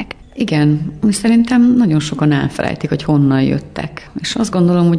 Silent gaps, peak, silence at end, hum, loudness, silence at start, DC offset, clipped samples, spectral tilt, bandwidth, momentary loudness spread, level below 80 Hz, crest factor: none; -4 dBFS; 0 s; none; -14 LUFS; 0 s; under 0.1%; under 0.1%; -6.5 dB/octave; 11 kHz; 12 LU; -42 dBFS; 10 dB